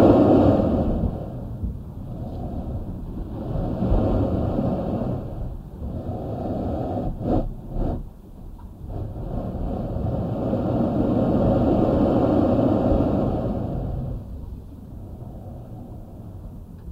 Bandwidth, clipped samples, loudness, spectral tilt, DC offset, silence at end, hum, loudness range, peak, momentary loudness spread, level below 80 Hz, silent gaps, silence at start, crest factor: 7.6 kHz; under 0.1%; -24 LUFS; -10.5 dB/octave; under 0.1%; 0 s; none; 9 LU; -4 dBFS; 19 LU; -32 dBFS; none; 0 s; 18 dB